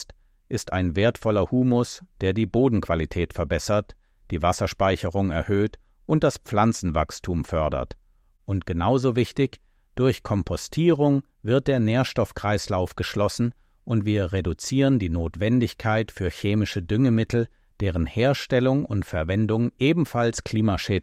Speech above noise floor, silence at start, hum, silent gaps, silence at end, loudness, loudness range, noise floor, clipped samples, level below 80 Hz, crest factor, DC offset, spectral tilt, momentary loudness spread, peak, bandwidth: 23 dB; 0 s; none; none; 0 s; -24 LUFS; 2 LU; -46 dBFS; under 0.1%; -42 dBFS; 16 dB; under 0.1%; -6.5 dB/octave; 7 LU; -8 dBFS; 15 kHz